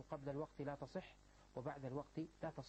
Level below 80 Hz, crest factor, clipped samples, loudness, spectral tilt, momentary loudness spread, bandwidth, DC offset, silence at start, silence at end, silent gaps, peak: -70 dBFS; 18 dB; under 0.1%; -50 LUFS; -7.5 dB/octave; 8 LU; 8.4 kHz; under 0.1%; 0 s; 0 s; none; -32 dBFS